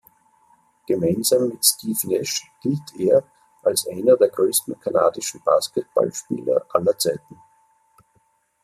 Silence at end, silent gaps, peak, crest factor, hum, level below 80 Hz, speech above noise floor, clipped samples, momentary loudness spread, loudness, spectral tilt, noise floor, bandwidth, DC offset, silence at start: 1.45 s; none; -2 dBFS; 20 dB; none; -64 dBFS; 44 dB; under 0.1%; 9 LU; -21 LUFS; -4 dB/octave; -64 dBFS; 15.5 kHz; under 0.1%; 0.9 s